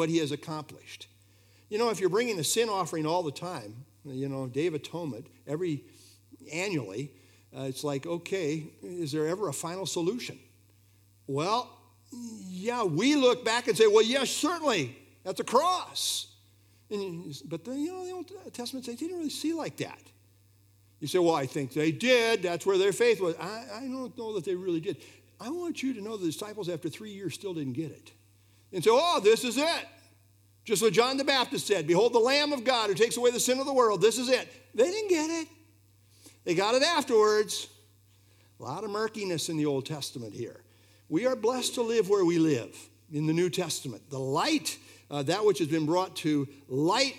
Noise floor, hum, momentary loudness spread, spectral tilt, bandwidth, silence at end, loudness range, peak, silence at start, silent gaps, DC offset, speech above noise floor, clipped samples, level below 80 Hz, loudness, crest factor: -62 dBFS; none; 16 LU; -4 dB/octave; 16 kHz; 0 s; 10 LU; -10 dBFS; 0 s; none; under 0.1%; 33 dB; under 0.1%; -80 dBFS; -29 LUFS; 20 dB